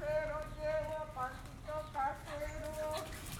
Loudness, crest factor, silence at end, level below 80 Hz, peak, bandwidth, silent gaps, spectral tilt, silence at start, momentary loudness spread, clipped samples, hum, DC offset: -41 LUFS; 14 dB; 0 s; -52 dBFS; -26 dBFS; 19.5 kHz; none; -4.5 dB/octave; 0 s; 6 LU; under 0.1%; none; under 0.1%